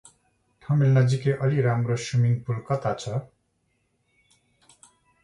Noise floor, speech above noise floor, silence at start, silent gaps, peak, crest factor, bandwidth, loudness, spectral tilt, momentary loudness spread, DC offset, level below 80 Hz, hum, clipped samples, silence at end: -72 dBFS; 49 dB; 0.7 s; none; -8 dBFS; 16 dB; 10.5 kHz; -24 LUFS; -7 dB/octave; 9 LU; under 0.1%; -60 dBFS; none; under 0.1%; 2 s